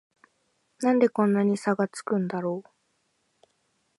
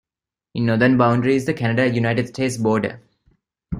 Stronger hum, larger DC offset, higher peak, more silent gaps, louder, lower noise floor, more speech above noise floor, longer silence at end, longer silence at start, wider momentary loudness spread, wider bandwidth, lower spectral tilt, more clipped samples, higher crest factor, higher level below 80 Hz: neither; neither; second, -8 dBFS vs -2 dBFS; neither; second, -25 LUFS vs -19 LUFS; second, -73 dBFS vs -89 dBFS; second, 48 dB vs 71 dB; first, 1.35 s vs 0 s; first, 0.8 s vs 0.55 s; about the same, 9 LU vs 8 LU; about the same, 11.5 kHz vs 12 kHz; about the same, -7 dB/octave vs -6.5 dB/octave; neither; about the same, 18 dB vs 18 dB; second, -78 dBFS vs -52 dBFS